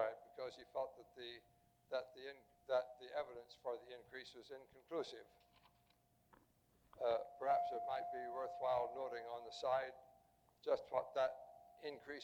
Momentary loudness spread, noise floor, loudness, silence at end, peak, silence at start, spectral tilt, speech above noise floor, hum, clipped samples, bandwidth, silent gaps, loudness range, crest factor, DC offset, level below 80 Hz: 15 LU; -77 dBFS; -45 LUFS; 0 s; -26 dBFS; 0 s; -4 dB/octave; 32 dB; none; under 0.1%; 16 kHz; none; 8 LU; 20 dB; under 0.1%; -82 dBFS